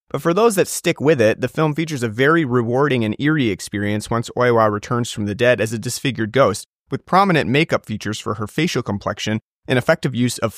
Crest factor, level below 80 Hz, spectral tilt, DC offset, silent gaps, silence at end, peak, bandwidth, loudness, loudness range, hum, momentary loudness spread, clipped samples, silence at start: 18 dB; -54 dBFS; -5.5 dB/octave; under 0.1%; 6.66-6.86 s, 9.42-9.62 s; 0 s; -2 dBFS; 15.5 kHz; -19 LUFS; 2 LU; none; 9 LU; under 0.1%; 0.15 s